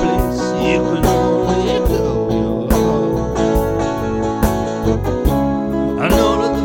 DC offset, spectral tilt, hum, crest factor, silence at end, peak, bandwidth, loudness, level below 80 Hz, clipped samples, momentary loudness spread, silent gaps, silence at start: under 0.1%; -6.5 dB/octave; none; 16 dB; 0 s; 0 dBFS; 19 kHz; -17 LUFS; -26 dBFS; under 0.1%; 4 LU; none; 0 s